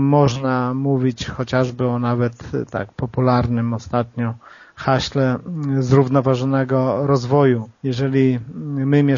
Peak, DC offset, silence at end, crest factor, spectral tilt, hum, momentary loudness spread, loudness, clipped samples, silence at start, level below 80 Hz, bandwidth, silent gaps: 0 dBFS; under 0.1%; 0 s; 18 dB; -7 dB/octave; none; 10 LU; -19 LUFS; under 0.1%; 0 s; -46 dBFS; 7.4 kHz; none